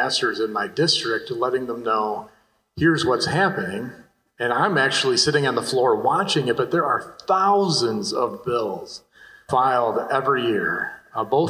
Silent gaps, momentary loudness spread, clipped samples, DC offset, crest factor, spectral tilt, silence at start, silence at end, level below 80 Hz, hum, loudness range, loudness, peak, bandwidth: none; 10 LU; under 0.1%; under 0.1%; 16 dB; -4 dB/octave; 0 s; 0 s; -56 dBFS; none; 3 LU; -21 LUFS; -4 dBFS; 16 kHz